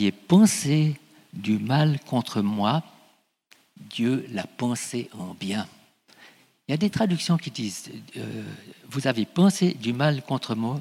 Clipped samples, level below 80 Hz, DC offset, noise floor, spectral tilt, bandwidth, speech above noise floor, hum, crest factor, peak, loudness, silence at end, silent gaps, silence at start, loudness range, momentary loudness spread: under 0.1%; -66 dBFS; under 0.1%; -62 dBFS; -5.5 dB/octave; 15 kHz; 38 dB; none; 18 dB; -6 dBFS; -25 LUFS; 0 s; none; 0 s; 7 LU; 17 LU